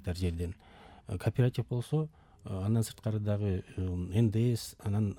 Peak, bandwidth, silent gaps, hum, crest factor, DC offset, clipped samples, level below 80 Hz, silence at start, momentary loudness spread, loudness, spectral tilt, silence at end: -16 dBFS; 16.5 kHz; none; none; 16 dB; under 0.1%; under 0.1%; -56 dBFS; 0 s; 12 LU; -33 LUFS; -7.5 dB/octave; 0 s